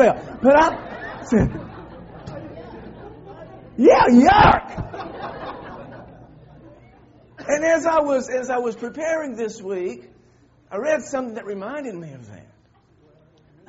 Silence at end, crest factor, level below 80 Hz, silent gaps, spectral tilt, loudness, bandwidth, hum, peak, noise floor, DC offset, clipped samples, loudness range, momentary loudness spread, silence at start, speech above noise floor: 1.3 s; 22 dB; -42 dBFS; none; -5 dB/octave; -19 LUFS; 8 kHz; none; 0 dBFS; -57 dBFS; under 0.1%; under 0.1%; 12 LU; 25 LU; 0 s; 38 dB